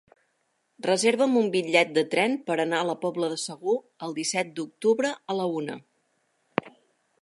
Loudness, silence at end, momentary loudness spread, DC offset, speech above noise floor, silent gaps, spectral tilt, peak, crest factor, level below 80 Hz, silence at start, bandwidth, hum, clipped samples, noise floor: -26 LUFS; 0.5 s; 11 LU; under 0.1%; 48 dB; none; -3.5 dB/octave; -4 dBFS; 22 dB; -80 dBFS; 0.8 s; 11.5 kHz; none; under 0.1%; -73 dBFS